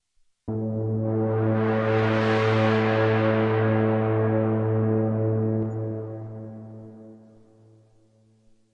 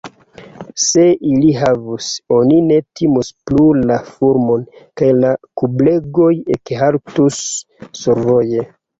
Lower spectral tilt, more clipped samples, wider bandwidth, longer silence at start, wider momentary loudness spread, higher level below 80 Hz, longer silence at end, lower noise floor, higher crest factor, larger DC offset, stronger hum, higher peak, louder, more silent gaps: first, -9 dB/octave vs -5.5 dB/octave; neither; second, 6.6 kHz vs 8 kHz; first, 0.45 s vs 0.05 s; first, 17 LU vs 10 LU; second, -60 dBFS vs -46 dBFS; first, 1.6 s vs 0.35 s; first, -60 dBFS vs -39 dBFS; about the same, 14 dB vs 12 dB; neither; neither; second, -10 dBFS vs -2 dBFS; second, -24 LUFS vs -14 LUFS; neither